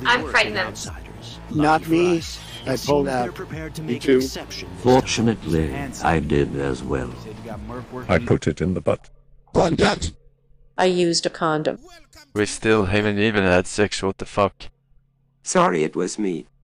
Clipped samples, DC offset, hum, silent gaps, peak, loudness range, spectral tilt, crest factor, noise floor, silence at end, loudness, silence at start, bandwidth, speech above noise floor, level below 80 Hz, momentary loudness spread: under 0.1%; under 0.1%; none; none; -6 dBFS; 2 LU; -5 dB/octave; 16 dB; -59 dBFS; 0.2 s; -21 LUFS; 0 s; 15.5 kHz; 38 dB; -40 dBFS; 15 LU